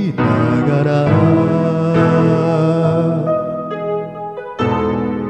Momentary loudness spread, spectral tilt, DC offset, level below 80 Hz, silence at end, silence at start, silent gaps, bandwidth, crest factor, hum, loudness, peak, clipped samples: 10 LU; -9 dB/octave; under 0.1%; -44 dBFS; 0 s; 0 s; none; 8.4 kHz; 14 dB; none; -15 LUFS; -2 dBFS; under 0.1%